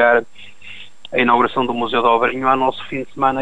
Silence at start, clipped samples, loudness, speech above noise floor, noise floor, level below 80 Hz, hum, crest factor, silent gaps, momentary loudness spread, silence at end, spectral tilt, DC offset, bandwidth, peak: 0 s; under 0.1%; -17 LUFS; 23 dB; -40 dBFS; -52 dBFS; none; 16 dB; none; 21 LU; 0 s; -6 dB/octave; 2%; 10 kHz; -2 dBFS